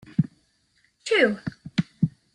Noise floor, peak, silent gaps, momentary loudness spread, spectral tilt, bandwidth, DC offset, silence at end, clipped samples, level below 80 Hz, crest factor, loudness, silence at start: -67 dBFS; -6 dBFS; none; 12 LU; -6 dB/octave; 10.5 kHz; under 0.1%; 0.25 s; under 0.1%; -58 dBFS; 20 dB; -25 LUFS; 0.2 s